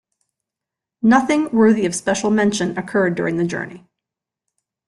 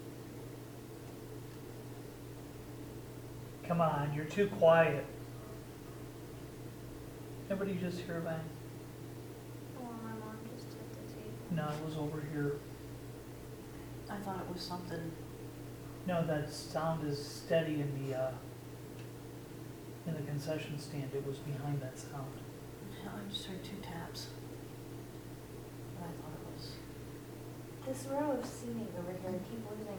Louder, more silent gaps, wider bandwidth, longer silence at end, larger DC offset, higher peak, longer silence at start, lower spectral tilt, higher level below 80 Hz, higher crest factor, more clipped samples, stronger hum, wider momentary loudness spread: first, -18 LUFS vs -40 LUFS; neither; second, 12 kHz vs over 20 kHz; first, 1.1 s vs 0 s; neither; first, -4 dBFS vs -14 dBFS; first, 1.05 s vs 0 s; about the same, -5 dB/octave vs -6 dB/octave; about the same, -58 dBFS vs -60 dBFS; second, 16 dB vs 26 dB; neither; neither; second, 8 LU vs 14 LU